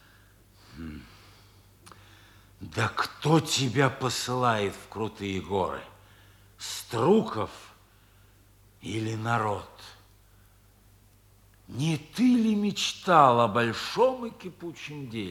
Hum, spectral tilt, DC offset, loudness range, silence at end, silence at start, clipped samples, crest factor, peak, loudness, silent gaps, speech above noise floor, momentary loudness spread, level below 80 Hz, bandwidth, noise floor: none; -5 dB/octave; under 0.1%; 11 LU; 0 s; 0.75 s; under 0.1%; 24 dB; -4 dBFS; -27 LUFS; none; 32 dB; 19 LU; -62 dBFS; 18 kHz; -58 dBFS